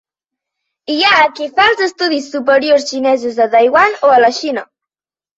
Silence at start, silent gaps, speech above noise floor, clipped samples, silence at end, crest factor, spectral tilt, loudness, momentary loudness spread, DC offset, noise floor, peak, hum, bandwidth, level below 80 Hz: 0.9 s; none; over 78 dB; under 0.1%; 0.75 s; 12 dB; -2.5 dB/octave; -12 LUFS; 10 LU; under 0.1%; under -90 dBFS; 0 dBFS; none; 8 kHz; -56 dBFS